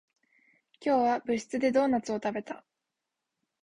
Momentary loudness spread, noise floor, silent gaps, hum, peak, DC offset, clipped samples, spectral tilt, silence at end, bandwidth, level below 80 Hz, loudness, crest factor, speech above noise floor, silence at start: 12 LU; -86 dBFS; none; none; -14 dBFS; under 0.1%; under 0.1%; -5 dB/octave; 1.05 s; 10.5 kHz; -70 dBFS; -29 LUFS; 18 dB; 58 dB; 0.8 s